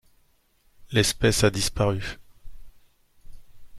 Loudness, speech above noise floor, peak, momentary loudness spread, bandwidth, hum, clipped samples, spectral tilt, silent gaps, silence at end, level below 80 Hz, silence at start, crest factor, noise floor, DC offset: -24 LUFS; 40 dB; -6 dBFS; 14 LU; 14.5 kHz; none; under 0.1%; -4 dB/octave; none; 0 s; -42 dBFS; 0.8 s; 22 dB; -63 dBFS; under 0.1%